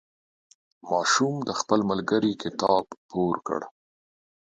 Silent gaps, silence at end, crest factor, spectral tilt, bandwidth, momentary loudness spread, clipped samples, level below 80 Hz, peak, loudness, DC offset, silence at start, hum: 2.97-3.09 s; 0.7 s; 20 dB; -4 dB/octave; 9.6 kHz; 10 LU; under 0.1%; -64 dBFS; -6 dBFS; -26 LUFS; under 0.1%; 0.85 s; none